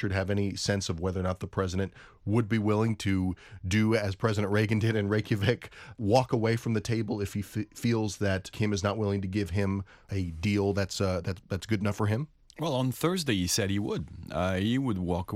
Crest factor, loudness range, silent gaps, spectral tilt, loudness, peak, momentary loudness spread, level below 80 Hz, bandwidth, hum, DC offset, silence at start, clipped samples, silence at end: 20 dB; 3 LU; none; -6 dB/octave; -29 LUFS; -8 dBFS; 8 LU; -54 dBFS; 16 kHz; none; under 0.1%; 0 s; under 0.1%; 0 s